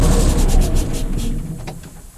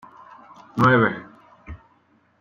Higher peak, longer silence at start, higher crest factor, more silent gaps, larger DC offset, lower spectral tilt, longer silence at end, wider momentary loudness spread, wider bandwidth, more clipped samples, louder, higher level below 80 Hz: about the same, -4 dBFS vs -4 dBFS; second, 0 s vs 0.75 s; second, 12 dB vs 20 dB; neither; neither; second, -5.5 dB/octave vs -8 dB/octave; second, 0.1 s vs 0.65 s; second, 15 LU vs 26 LU; first, 14.5 kHz vs 7.4 kHz; neither; about the same, -20 LUFS vs -19 LUFS; first, -18 dBFS vs -52 dBFS